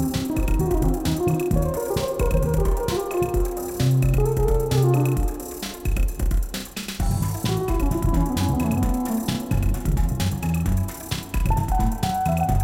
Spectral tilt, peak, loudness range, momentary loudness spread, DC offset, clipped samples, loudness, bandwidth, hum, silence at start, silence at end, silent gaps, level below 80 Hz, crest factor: -6.5 dB/octave; -8 dBFS; 2 LU; 7 LU; under 0.1%; under 0.1%; -23 LUFS; 16.5 kHz; none; 0 s; 0 s; none; -26 dBFS; 14 dB